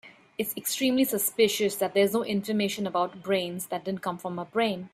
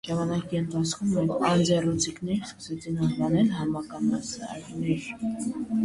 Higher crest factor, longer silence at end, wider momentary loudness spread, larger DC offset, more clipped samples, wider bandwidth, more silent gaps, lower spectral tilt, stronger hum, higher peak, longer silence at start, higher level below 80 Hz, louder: about the same, 18 dB vs 16 dB; about the same, 0.05 s vs 0 s; about the same, 9 LU vs 9 LU; neither; neither; first, 16 kHz vs 11.5 kHz; neither; second, -4 dB/octave vs -5.5 dB/octave; neither; about the same, -10 dBFS vs -10 dBFS; about the same, 0.05 s vs 0.05 s; second, -70 dBFS vs -54 dBFS; about the same, -27 LUFS vs -27 LUFS